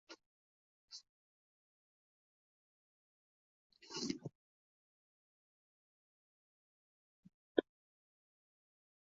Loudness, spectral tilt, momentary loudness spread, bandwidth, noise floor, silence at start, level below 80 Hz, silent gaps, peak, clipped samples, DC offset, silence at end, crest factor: -42 LUFS; -4 dB/octave; 20 LU; 7.4 kHz; under -90 dBFS; 0.1 s; -88 dBFS; 0.26-0.88 s, 1.09-3.70 s, 4.35-7.23 s, 7.34-7.55 s; -16 dBFS; under 0.1%; under 0.1%; 1.4 s; 36 dB